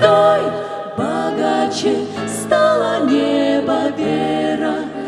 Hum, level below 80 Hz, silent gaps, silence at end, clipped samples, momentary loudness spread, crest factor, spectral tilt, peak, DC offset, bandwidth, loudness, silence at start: none; -56 dBFS; none; 0 s; under 0.1%; 8 LU; 16 dB; -5 dB/octave; 0 dBFS; under 0.1%; 14 kHz; -17 LUFS; 0 s